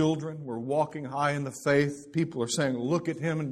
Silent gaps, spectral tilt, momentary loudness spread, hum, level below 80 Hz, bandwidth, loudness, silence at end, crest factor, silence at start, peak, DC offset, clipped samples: none; -5.5 dB/octave; 6 LU; none; -64 dBFS; 13.5 kHz; -29 LUFS; 0 s; 18 dB; 0 s; -10 dBFS; under 0.1%; under 0.1%